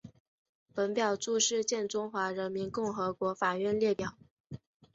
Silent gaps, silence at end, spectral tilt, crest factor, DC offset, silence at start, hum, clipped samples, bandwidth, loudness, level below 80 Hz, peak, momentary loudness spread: 0.20-0.66 s, 4.31-4.44 s; 0.4 s; -3 dB/octave; 18 dB; under 0.1%; 0.05 s; none; under 0.1%; 8 kHz; -32 LUFS; -68 dBFS; -16 dBFS; 14 LU